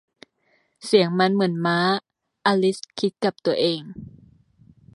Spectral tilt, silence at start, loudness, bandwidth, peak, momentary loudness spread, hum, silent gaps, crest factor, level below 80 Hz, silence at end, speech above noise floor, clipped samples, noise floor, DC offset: -5.5 dB/octave; 0.85 s; -22 LUFS; 11.5 kHz; -4 dBFS; 10 LU; none; none; 20 dB; -64 dBFS; 0.85 s; 45 dB; under 0.1%; -66 dBFS; under 0.1%